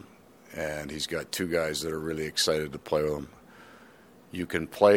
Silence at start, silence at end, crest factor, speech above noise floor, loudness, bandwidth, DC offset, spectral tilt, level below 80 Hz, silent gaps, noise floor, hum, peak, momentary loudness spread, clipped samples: 0.5 s; 0 s; 24 dB; 26 dB; -30 LUFS; 18.5 kHz; under 0.1%; -3.5 dB/octave; -56 dBFS; none; -54 dBFS; none; -6 dBFS; 13 LU; under 0.1%